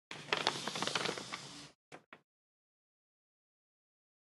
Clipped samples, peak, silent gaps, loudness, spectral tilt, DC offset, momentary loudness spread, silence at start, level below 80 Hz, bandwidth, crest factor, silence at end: under 0.1%; -10 dBFS; 1.75-1.92 s, 2.06-2.12 s; -37 LUFS; -2 dB/octave; under 0.1%; 22 LU; 0.1 s; -82 dBFS; 11.5 kHz; 34 dB; 2.15 s